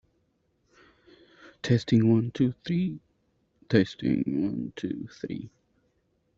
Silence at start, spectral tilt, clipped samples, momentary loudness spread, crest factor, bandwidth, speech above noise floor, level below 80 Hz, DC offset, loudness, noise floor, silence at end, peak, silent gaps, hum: 1.45 s; -7.5 dB/octave; under 0.1%; 15 LU; 22 dB; 7.6 kHz; 46 dB; -62 dBFS; under 0.1%; -27 LUFS; -72 dBFS; 0.9 s; -6 dBFS; none; none